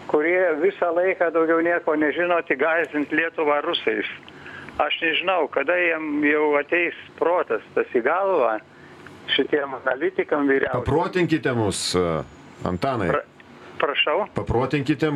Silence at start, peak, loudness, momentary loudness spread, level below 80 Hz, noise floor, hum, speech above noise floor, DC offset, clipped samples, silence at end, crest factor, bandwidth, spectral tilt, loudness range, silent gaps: 0 s; -4 dBFS; -22 LUFS; 6 LU; -50 dBFS; -44 dBFS; none; 22 dB; under 0.1%; under 0.1%; 0 s; 18 dB; 12.5 kHz; -5 dB/octave; 3 LU; none